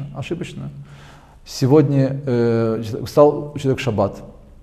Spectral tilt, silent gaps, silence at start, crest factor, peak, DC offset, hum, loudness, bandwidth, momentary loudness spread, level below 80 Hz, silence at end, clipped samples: -7.5 dB/octave; none; 0 s; 18 dB; 0 dBFS; under 0.1%; none; -18 LUFS; 14.5 kHz; 18 LU; -46 dBFS; 0.25 s; under 0.1%